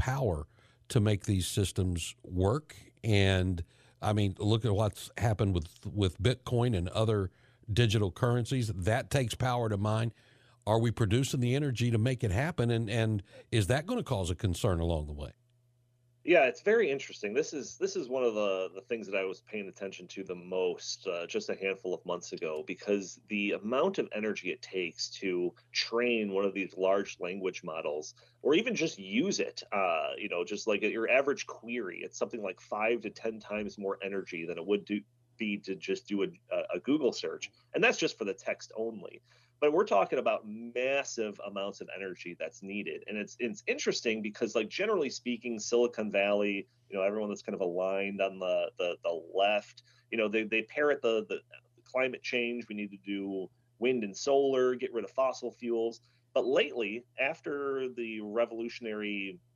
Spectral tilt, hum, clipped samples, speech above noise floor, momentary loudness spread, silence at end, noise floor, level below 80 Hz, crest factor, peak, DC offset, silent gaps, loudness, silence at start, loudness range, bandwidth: -5.5 dB/octave; none; under 0.1%; 38 dB; 10 LU; 0.2 s; -70 dBFS; -56 dBFS; 20 dB; -12 dBFS; under 0.1%; none; -32 LUFS; 0 s; 5 LU; 14 kHz